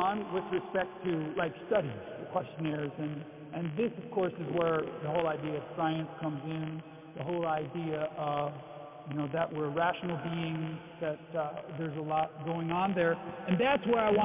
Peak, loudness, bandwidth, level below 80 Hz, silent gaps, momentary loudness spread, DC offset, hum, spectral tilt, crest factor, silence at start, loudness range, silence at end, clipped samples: -12 dBFS; -34 LUFS; 3.9 kHz; -66 dBFS; none; 9 LU; under 0.1%; none; -5 dB/octave; 22 dB; 0 s; 2 LU; 0 s; under 0.1%